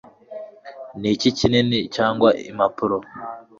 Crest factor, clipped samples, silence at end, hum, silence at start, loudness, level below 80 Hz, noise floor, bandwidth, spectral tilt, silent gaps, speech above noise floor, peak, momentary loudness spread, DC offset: 20 dB; under 0.1%; 0.2 s; none; 0.3 s; -20 LUFS; -50 dBFS; -39 dBFS; 7.8 kHz; -5.5 dB/octave; none; 19 dB; -2 dBFS; 20 LU; under 0.1%